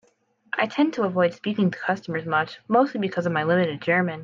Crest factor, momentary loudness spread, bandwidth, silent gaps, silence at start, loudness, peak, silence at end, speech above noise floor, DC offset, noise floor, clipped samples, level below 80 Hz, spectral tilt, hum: 16 dB; 5 LU; 7.4 kHz; none; 0.55 s; -24 LUFS; -6 dBFS; 0 s; 40 dB; under 0.1%; -64 dBFS; under 0.1%; -72 dBFS; -7.5 dB/octave; none